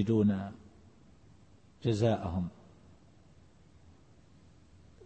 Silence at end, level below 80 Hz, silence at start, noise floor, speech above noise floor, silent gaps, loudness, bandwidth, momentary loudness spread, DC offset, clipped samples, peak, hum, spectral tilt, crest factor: 0 s; -60 dBFS; 0 s; -61 dBFS; 31 dB; none; -32 LUFS; 8.6 kHz; 15 LU; under 0.1%; under 0.1%; -16 dBFS; none; -8 dB/octave; 20 dB